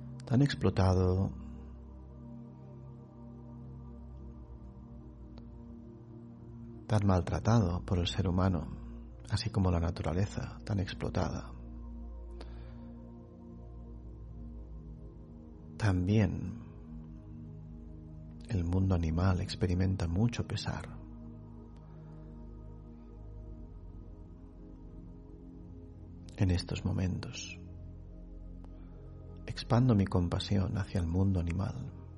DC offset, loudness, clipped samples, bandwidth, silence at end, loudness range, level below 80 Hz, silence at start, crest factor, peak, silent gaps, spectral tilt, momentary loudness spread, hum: under 0.1%; -32 LUFS; under 0.1%; 10.5 kHz; 0 s; 17 LU; -48 dBFS; 0 s; 20 dB; -14 dBFS; none; -7 dB/octave; 21 LU; none